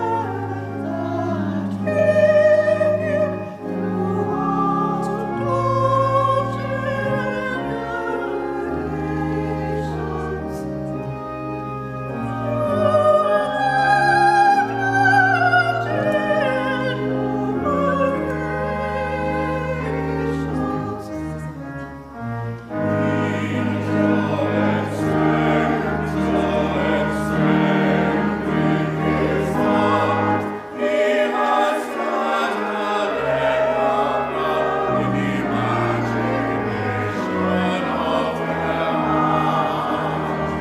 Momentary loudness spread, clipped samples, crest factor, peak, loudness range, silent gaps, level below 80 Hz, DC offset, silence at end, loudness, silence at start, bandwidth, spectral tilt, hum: 11 LU; under 0.1%; 16 dB; -4 dBFS; 8 LU; none; -42 dBFS; under 0.1%; 0 s; -20 LUFS; 0 s; 14.5 kHz; -7 dB/octave; none